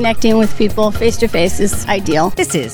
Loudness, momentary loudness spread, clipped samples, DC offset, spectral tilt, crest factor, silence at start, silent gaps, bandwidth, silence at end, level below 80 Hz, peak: -15 LUFS; 4 LU; under 0.1%; under 0.1%; -4.5 dB/octave; 12 dB; 0 s; none; 19.5 kHz; 0 s; -30 dBFS; 0 dBFS